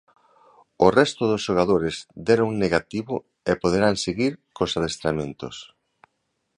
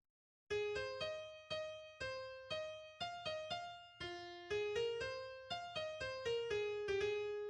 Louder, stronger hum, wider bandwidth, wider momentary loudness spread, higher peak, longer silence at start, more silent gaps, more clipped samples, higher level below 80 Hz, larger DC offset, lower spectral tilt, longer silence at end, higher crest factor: first, -23 LUFS vs -44 LUFS; neither; about the same, 11 kHz vs 10 kHz; about the same, 11 LU vs 9 LU; first, -2 dBFS vs -30 dBFS; first, 0.8 s vs 0.5 s; neither; neither; first, -50 dBFS vs -70 dBFS; neither; first, -5 dB/octave vs -3.5 dB/octave; first, 0.95 s vs 0 s; first, 22 dB vs 14 dB